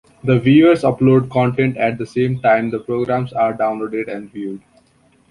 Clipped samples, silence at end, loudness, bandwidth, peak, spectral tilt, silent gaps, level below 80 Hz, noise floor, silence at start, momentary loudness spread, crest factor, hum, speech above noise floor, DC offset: under 0.1%; 0.7 s; -16 LUFS; 11 kHz; -2 dBFS; -8.5 dB/octave; none; -52 dBFS; -55 dBFS; 0.25 s; 16 LU; 14 dB; none; 39 dB; under 0.1%